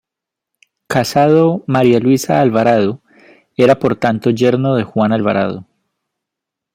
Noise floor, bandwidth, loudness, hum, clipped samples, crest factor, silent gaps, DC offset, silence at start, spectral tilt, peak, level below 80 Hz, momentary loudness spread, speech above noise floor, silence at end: -83 dBFS; 16 kHz; -14 LUFS; none; under 0.1%; 14 dB; none; under 0.1%; 0.9 s; -6.5 dB/octave; 0 dBFS; -54 dBFS; 8 LU; 70 dB; 1.15 s